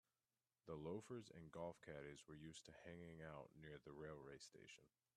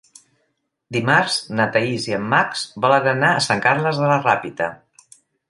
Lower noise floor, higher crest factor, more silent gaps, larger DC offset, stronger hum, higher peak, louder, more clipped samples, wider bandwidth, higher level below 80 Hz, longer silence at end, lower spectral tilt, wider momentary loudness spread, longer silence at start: first, under -90 dBFS vs -71 dBFS; about the same, 18 dB vs 20 dB; neither; neither; neither; second, -40 dBFS vs 0 dBFS; second, -58 LUFS vs -18 LUFS; neither; first, 13 kHz vs 11.5 kHz; second, -80 dBFS vs -62 dBFS; second, 0.3 s vs 0.75 s; about the same, -5.5 dB/octave vs -4.5 dB/octave; about the same, 8 LU vs 7 LU; second, 0.65 s vs 0.9 s